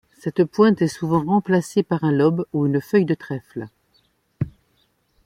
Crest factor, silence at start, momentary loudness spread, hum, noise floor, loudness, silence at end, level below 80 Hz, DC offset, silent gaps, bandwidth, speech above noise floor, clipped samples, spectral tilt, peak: 18 dB; 0.25 s; 13 LU; none; -65 dBFS; -21 LUFS; 0.75 s; -56 dBFS; under 0.1%; none; 15.5 kHz; 45 dB; under 0.1%; -7.5 dB/octave; -4 dBFS